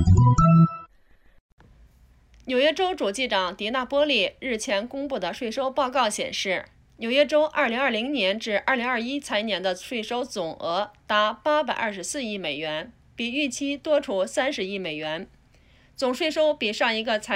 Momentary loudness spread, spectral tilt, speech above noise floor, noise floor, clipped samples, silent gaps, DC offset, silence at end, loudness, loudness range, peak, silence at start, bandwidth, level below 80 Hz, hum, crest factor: 9 LU; -5 dB/octave; 33 dB; -57 dBFS; under 0.1%; 1.40-1.58 s; under 0.1%; 0 s; -24 LUFS; 3 LU; -8 dBFS; 0 s; 13.5 kHz; -44 dBFS; none; 18 dB